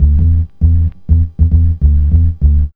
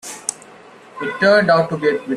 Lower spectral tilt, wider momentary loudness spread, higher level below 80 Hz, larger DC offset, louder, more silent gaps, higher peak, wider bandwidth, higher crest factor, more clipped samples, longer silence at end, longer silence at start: first, -13 dB/octave vs -4 dB/octave; second, 3 LU vs 14 LU; first, -12 dBFS vs -62 dBFS; neither; first, -13 LUFS vs -16 LUFS; neither; about the same, 0 dBFS vs 0 dBFS; second, 0.9 kHz vs 14 kHz; second, 10 dB vs 18 dB; first, 0.4% vs under 0.1%; about the same, 0.05 s vs 0 s; about the same, 0 s vs 0.05 s